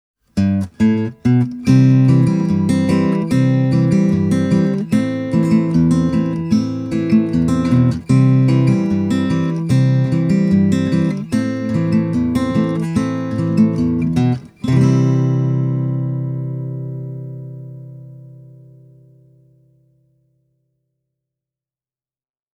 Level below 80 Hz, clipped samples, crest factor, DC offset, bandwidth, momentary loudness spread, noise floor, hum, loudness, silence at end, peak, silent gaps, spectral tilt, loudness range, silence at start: -44 dBFS; under 0.1%; 16 dB; under 0.1%; 10 kHz; 10 LU; under -90 dBFS; none; -16 LUFS; 4.35 s; 0 dBFS; none; -8.5 dB/octave; 9 LU; 0.35 s